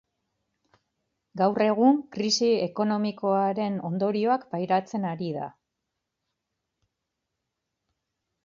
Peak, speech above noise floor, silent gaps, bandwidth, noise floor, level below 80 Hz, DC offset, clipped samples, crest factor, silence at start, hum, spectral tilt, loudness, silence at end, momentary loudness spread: -10 dBFS; 58 dB; none; 7.6 kHz; -83 dBFS; -74 dBFS; under 0.1%; under 0.1%; 18 dB; 1.35 s; none; -5.5 dB/octave; -25 LUFS; 2.95 s; 10 LU